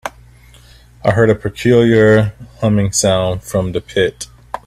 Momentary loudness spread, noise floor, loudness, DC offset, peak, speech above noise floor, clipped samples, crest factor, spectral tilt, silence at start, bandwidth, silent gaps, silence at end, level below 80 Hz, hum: 11 LU; -43 dBFS; -14 LUFS; under 0.1%; 0 dBFS; 30 dB; under 0.1%; 14 dB; -5.5 dB/octave; 0.05 s; 14.5 kHz; none; 0.1 s; -40 dBFS; 60 Hz at -35 dBFS